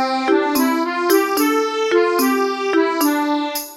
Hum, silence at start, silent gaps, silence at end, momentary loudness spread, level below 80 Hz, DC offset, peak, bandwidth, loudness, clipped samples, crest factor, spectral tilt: none; 0 s; none; 0 s; 3 LU; -64 dBFS; under 0.1%; -2 dBFS; 17 kHz; -17 LUFS; under 0.1%; 14 dB; -1.5 dB/octave